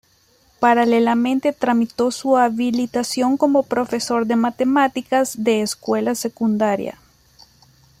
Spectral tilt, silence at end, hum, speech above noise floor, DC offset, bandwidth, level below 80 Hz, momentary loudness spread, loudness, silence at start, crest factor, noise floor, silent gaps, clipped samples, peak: -4.5 dB/octave; 1.1 s; none; 39 dB; under 0.1%; 15.5 kHz; -60 dBFS; 5 LU; -19 LUFS; 0.6 s; 16 dB; -57 dBFS; none; under 0.1%; -4 dBFS